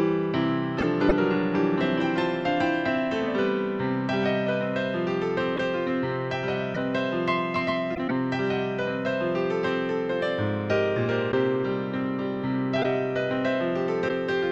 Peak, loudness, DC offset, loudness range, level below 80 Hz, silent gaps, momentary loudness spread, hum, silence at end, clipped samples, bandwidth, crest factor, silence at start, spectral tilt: -6 dBFS; -26 LUFS; under 0.1%; 2 LU; -52 dBFS; none; 4 LU; none; 0 s; under 0.1%; 8 kHz; 20 dB; 0 s; -7.5 dB/octave